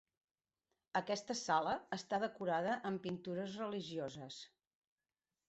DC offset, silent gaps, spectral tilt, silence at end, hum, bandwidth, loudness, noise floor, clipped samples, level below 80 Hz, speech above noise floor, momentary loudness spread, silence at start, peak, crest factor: under 0.1%; none; -3.5 dB/octave; 1 s; none; 8 kHz; -41 LUFS; under -90 dBFS; under 0.1%; -80 dBFS; over 50 dB; 11 LU; 0.95 s; -22 dBFS; 20 dB